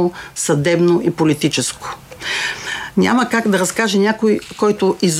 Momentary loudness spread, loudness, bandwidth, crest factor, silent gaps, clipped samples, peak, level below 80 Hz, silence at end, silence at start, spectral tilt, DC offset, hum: 8 LU; -16 LUFS; 16 kHz; 14 dB; none; under 0.1%; -2 dBFS; -52 dBFS; 0 s; 0 s; -4.5 dB/octave; under 0.1%; none